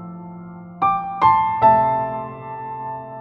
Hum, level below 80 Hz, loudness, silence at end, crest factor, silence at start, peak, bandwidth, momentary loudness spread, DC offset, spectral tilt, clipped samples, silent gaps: none; -52 dBFS; -18 LUFS; 0 s; 16 dB; 0 s; -4 dBFS; 5.8 kHz; 21 LU; under 0.1%; -8.5 dB/octave; under 0.1%; none